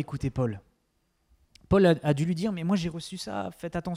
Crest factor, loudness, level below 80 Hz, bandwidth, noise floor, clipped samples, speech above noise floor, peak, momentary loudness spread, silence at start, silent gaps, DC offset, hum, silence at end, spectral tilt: 18 dB; -28 LUFS; -50 dBFS; 14.5 kHz; -73 dBFS; under 0.1%; 46 dB; -10 dBFS; 13 LU; 0 s; none; under 0.1%; none; 0 s; -7 dB/octave